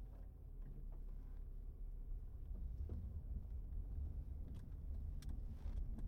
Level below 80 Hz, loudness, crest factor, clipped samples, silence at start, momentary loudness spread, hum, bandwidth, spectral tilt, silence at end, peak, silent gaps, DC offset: -48 dBFS; -52 LUFS; 12 dB; under 0.1%; 0 s; 7 LU; none; 6 kHz; -8.5 dB/octave; 0 s; -36 dBFS; none; under 0.1%